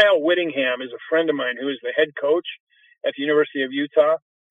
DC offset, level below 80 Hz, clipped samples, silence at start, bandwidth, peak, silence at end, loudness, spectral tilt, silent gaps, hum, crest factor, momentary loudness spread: under 0.1%; -82 dBFS; under 0.1%; 0 s; 3.9 kHz; -4 dBFS; 0.35 s; -21 LUFS; -6 dB/octave; 2.60-2.67 s; none; 18 dB; 10 LU